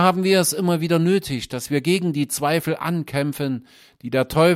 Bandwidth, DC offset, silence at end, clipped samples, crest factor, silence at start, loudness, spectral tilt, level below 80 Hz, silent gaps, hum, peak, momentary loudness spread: 16 kHz; under 0.1%; 0 s; under 0.1%; 18 dB; 0 s; -21 LUFS; -5 dB/octave; -52 dBFS; none; none; -2 dBFS; 9 LU